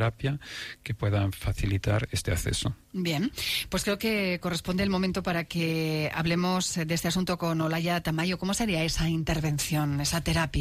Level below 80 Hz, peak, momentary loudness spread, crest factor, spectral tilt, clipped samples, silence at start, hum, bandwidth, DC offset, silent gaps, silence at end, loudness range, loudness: -42 dBFS; -16 dBFS; 4 LU; 12 dB; -4.5 dB/octave; under 0.1%; 0 s; none; 15.5 kHz; under 0.1%; none; 0 s; 2 LU; -28 LUFS